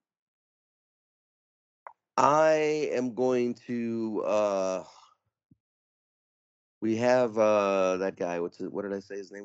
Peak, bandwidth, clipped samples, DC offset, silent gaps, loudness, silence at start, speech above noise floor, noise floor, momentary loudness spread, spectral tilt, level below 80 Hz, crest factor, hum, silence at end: -6 dBFS; 8 kHz; under 0.1%; under 0.1%; 5.45-5.50 s, 5.60-6.81 s; -27 LUFS; 2.15 s; over 63 dB; under -90 dBFS; 12 LU; -4.5 dB/octave; -76 dBFS; 24 dB; none; 0 s